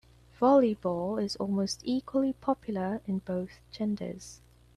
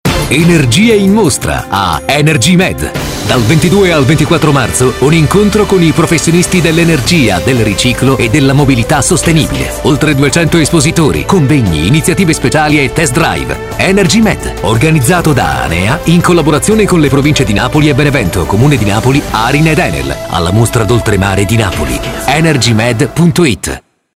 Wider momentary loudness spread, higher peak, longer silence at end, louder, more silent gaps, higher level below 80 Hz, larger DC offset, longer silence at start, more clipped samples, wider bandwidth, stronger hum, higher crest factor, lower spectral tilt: first, 12 LU vs 5 LU; second, -12 dBFS vs 0 dBFS; about the same, 0.4 s vs 0.35 s; second, -30 LUFS vs -9 LUFS; neither; second, -60 dBFS vs -24 dBFS; neither; first, 0.4 s vs 0.05 s; second, under 0.1% vs 0.3%; second, 12.5 kHz vs 16.5 kHz; neither; first, 18 dB vs 8 dB; about the same, -6 dB/octave vs -5 dB/octave